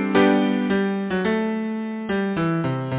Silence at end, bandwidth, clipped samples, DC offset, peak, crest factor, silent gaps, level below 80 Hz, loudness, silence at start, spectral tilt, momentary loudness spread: 0 s; 4 kHz; under 0.1%; under 0.1%; -4 dBFS; 16 dB; none; -54 dBFS; -22 LUFS; 0 s; -11 dB/octave; 8 LU